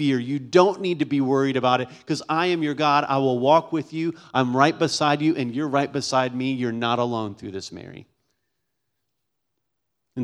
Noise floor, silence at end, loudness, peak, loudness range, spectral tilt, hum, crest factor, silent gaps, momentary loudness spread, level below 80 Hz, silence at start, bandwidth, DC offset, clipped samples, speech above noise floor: -80 dBFS; 0 s; -22 LUFS; -2 dBFS; 9 LU; -5.5 dB/octave; none; 22 dB; none; 11 LU; -68 dBFS; 0 s; 11 kHz; under 0.1%; under 0.1%; 58 dB